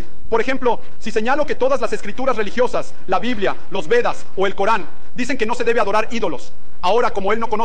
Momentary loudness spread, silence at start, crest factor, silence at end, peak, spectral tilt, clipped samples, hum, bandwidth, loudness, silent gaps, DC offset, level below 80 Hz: 7 LU; 0 s; 12 dB; 0 s; -4 dBFS; -4.5 dB/octave; under 0.1%; none; 9.8 kHz; -20 LUFS; none; 20%; -42 dBFS